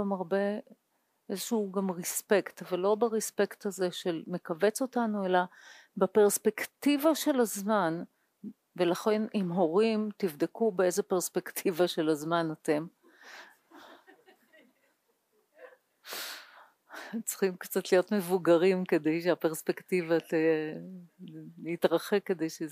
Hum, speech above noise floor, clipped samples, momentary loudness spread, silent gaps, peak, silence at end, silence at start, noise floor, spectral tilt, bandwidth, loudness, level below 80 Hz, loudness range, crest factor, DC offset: none; 44 dB; under 0.1%; 17 LU; none; -12 dBFS; 0 s; 0 s; -74 dBFS; -4.5 dB/octave; 15.5 kHz; -30 LUFS; -88 dBFS; 10 LU; 20 dB; under 0.1%